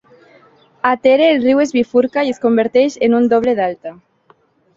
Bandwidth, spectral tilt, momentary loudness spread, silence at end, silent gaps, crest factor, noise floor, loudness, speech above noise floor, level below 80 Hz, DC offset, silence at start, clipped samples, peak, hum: 7.6 kHz; -5 dB/octave; 8 LU; 0.85 s; none; 14 dB; -54 dBFS; -14 LUFS; 40 dB; -58 dBFS; under 0.1%; 0.85 s; under 0.1%; -2 dBFS; none